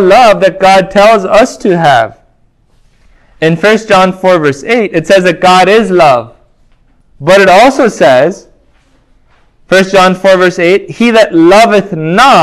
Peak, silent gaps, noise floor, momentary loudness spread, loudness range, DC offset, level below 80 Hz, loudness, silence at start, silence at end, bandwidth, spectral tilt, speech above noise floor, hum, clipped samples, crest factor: 0 dBFS; none; -48 dBFS; 6 LU; 3 LU; under 0.1%; -42 dBFS; -6 LUFS; 0 s; 0 s; 16 kHz; -5 dB/octave; 43 dB; none; 5%; 6 dB